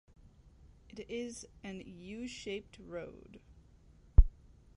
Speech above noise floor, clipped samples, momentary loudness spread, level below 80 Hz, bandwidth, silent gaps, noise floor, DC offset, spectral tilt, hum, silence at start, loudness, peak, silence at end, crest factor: 17 dB; under 0.1%; 23 LU; -36 dBFS; 10.5 kHz; none; -61 dBFS; under 0.1%; -6 dB/octave; none; 0.95 s; -38 LUFS; -8 dBFS; 0.45 s; 26 dB